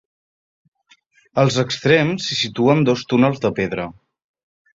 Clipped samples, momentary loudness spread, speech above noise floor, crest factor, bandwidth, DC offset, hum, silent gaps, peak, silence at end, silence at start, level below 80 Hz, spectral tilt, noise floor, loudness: under 0.1%; 9 LU; 39 dB; 18 dB; 7.8 kHz; under 0.1%; none; none; -2 dBFS; 0.85 s; 1.35 s; -54 dBFS; -5.5 dB/octave; -57 dBFS; -18 LUFS